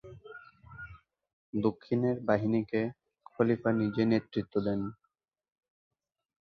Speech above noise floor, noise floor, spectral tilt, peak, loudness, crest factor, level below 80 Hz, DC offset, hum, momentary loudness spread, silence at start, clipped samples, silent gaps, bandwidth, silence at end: 51 dB; -81 dBFS; -9.5 dB/octave; -12 dBFS; -31 LUFS; 20 dB; -64 dBFS; under 0.1%; none; 20 LU; 0.05 s; under 0.1%; 1.33-1.53 s; 6.2 kHz; 1.55 s